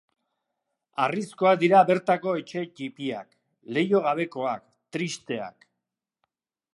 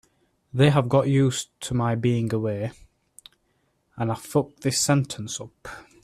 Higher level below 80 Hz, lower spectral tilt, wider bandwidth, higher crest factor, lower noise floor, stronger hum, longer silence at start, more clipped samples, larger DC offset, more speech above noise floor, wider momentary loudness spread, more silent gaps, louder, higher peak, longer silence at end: second, -80 dBFS vs -56 dBFS; about the same, -5.5 dB/octave vs -5.5 dB/octave; second, 11.5 kHz vs 14.5 kHz; about the same, 22 dB vs 18 dB; first, -85 dBFS vs -70 dBFS; neither; first, 1 s vs 0.55 s; neither; neither; first, 61 dB vs 46 dB; first, 17 LU vs 14 LU; neither; about the same, -25 LUFS vs -24 LUFS; about the same, -6 dBFS vs -6 dBFS; first, 1.25 s vs 0.2 s